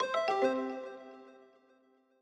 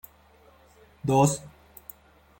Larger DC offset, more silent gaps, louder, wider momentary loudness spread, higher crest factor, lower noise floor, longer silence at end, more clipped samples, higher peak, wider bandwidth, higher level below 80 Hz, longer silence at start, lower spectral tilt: neither; neither; second, -33 LUFS vs -25 LUFS; about the same, 22 LU vs 24 LU; about the same, 18 dB vs 22 dB; first, -68 dBFS vs -57 dBFS; about the same, 0.85 s vs 0.9 s; neither; second, -18 dBFS vs -8 dBFS; second, 9.8 kHz vs 17 kHz; second, -86 dBFS vs -58 dBFS; second, 0 s vs 1.05 s; second, -3.5 dB/octave vs -6 dB/octave